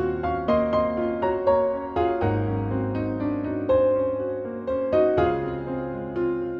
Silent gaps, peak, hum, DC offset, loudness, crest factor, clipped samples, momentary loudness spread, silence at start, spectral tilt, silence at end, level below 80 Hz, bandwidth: none; -8 dBFS; none; under 0.1%; -24 LUFS; 16 dB; under 0.1%; 8 LU; 0 s; -10 dB/octave; 0 s; -44 dBFS; 5.4 kHz